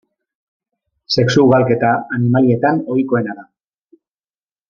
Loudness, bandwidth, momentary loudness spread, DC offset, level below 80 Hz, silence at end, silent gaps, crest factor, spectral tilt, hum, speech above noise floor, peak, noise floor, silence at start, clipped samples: -15 LUFS; 7.2 kHz; 8 LU; under 0.1%; -54 dBFS; 1.25 s; none; 16 dB; -7 dB/octave; none; over 76 dB; -2 dBFS; under -90 dBFS; 1.1 s; under 0.1%